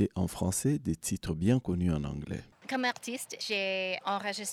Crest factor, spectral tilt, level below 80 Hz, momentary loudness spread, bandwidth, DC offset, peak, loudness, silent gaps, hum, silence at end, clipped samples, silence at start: 18 dB; -4.5 dB/octave; -54 dBFS; 9 LU; 16.5 kHz; under 0.1%; -14 dBFS; -32 LUFS; none; none; 0 s; under 0.1%; 0 s